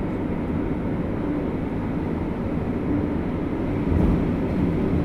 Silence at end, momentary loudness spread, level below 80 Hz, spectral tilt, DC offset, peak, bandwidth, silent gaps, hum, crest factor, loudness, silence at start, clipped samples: 0 s; 5 LU; -32 dBFS; -10 dB/octave; under 0.1%; -10 dBFS; 10.5 kHz; none; none; 14 dB; -25 LUFS; 0 s; under 0.1%